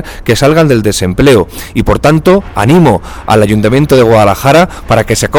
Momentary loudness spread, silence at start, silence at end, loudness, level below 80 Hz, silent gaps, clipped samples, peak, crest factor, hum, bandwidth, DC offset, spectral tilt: 5 LU; 0 s; 0 s; -8 LUFS; -26 dBFS; none; 1%; 0 dBFS; 8 dB; none; 19.5 kHz; under 0.1%; -6 dB/octave